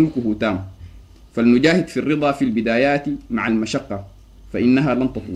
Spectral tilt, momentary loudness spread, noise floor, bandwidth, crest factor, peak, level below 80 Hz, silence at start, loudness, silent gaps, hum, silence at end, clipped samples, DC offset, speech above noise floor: -6.5 dB/octave; 14 LU; -42 dBFS; 10.5 kHz; 16 dB; -2 dBFS; -44 dBFS; 0 s; -19 LUFS; none; none; 0 s; under 0.1%; under 0.1%; 24 dB